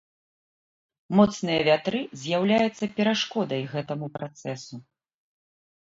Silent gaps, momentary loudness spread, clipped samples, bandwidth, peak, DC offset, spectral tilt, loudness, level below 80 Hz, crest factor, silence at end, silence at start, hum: none; 14 LU; under 0.1%; 7.8 kHz; -6 dBFS; under 0.1%; -5.5 dB/octave; -25 LUFS; -64 dBFS; 22 dB; 1.15 s; 1.1 s; none